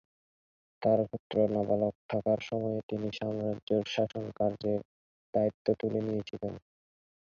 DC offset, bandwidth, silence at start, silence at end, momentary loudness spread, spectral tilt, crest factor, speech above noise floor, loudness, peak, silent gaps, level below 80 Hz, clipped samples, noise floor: under 0.1%; 7 kHz; 0.8 s; 0.65 s; 7 LU; -7.5 dB/octave; 20 dB; over 59 dB; -32 LUFS; -14 dBFS; 1.19-1.30 s, 1.95-2.09 s, 2.83-2.89 s, 3.62-3.67 s, 4.85-5.33 s, 5.54-5.65 s; -64 dBFS; under 0.1%; under -90 dBFS